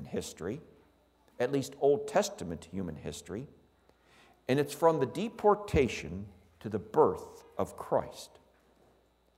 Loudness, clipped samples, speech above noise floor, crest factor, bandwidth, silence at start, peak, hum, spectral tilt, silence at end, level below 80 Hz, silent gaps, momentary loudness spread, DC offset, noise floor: -32 LUFS; under 0.1%; 36 dB; 22 dB; 16 kHz; 0 s; -10 dBFS; none; -5.5 dB/octave; 1.1 s; -54 dBFS; none; 17 LU; under 0.1%; -67 dBFS